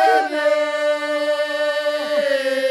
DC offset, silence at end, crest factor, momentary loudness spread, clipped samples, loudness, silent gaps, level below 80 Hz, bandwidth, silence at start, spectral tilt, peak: under 0.1%; 0 s; 14 dB; 3 LU; under 0.1%; -19 LUFS; none; -80 dBFS; 13.5 kHz; 0 s; -1.5 dB/octave; -4 dBFS